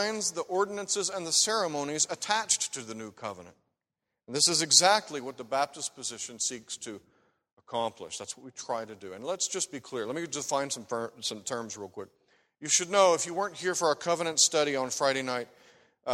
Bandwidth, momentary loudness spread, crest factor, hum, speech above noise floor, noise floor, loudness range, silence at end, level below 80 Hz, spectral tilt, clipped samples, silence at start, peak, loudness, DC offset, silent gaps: 16 kHz; 17 LU; 26 dB; none; 57 dB; -87 dBFS; 9 LU; 0 s; -76 dBFS; -1 dB/octave; under 0.1%; 0 s; -6 dBFS; -28 LUFS; under 0.1%; 7.53-7.57 s